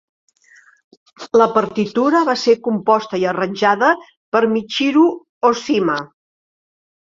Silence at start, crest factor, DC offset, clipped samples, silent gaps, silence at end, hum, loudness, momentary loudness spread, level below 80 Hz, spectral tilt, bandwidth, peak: 1.2 s; 16 dB; under 0.1%; under 0.1%; 4.17-4.32 s, 5.29-5.41 s; 1.1 s; none; -17 LUFS; 6 LU; -62 dBFS; -5 dB/octave; 7.6 kHz; -2 dBFS